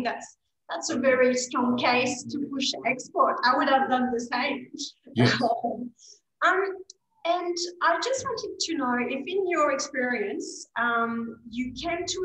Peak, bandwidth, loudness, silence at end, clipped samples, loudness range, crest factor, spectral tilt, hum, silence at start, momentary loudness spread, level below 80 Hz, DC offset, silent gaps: -8 dBFS; 10 kHz; -26 LUFS; 0 s; under 0.1%; 3 LU; 18 dB; -4 dB/octave; none; 0 s; 12 LU; -64 dBFS; under 0.1%; none